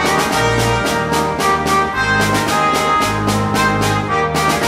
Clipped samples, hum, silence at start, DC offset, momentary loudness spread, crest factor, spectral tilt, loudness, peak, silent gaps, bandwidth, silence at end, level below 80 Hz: under 0.1%; none; 0 s; under 0.1%; 2 LU; 12 dB; -4 dB/octave; -15 LUFS; -2 dBFS; none; 16 kHz; 0 s; -34 dBFS